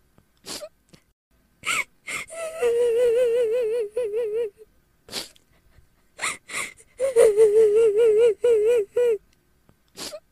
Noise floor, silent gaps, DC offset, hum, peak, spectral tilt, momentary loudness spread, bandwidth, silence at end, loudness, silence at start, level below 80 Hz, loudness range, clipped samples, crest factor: -61 dBFS; 1.13-1.31 s; under 0.1%; none; -6 dBFS; -2 dB/octave; 18 LU; 14 kHz; 0.15 s; -22 LUFS; 0.45 s; -62 dBFS; 9 LU; under 0.1%; 16 dB